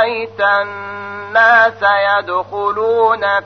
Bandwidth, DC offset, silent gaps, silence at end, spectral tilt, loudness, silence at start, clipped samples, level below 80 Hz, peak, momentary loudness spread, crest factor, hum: 6.4 kHz; 0.1%; none; 0 s; -4.5 dB/octave; -13 LUFS; 0 s; under 0.1%; -60 dBFS; 0 dBFS; 14 LU; 14 dB; none